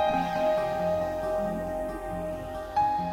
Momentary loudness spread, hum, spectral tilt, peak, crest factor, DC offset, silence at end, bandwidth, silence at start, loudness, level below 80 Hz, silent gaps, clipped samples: 8 LU; none; -6.5 dB/octave; -14 dBFS; 14 dB; under 0.1%; 0 s; 16.5 kHz; 0 s; -29 LUFS; -48 dBFS; none; under 0.1%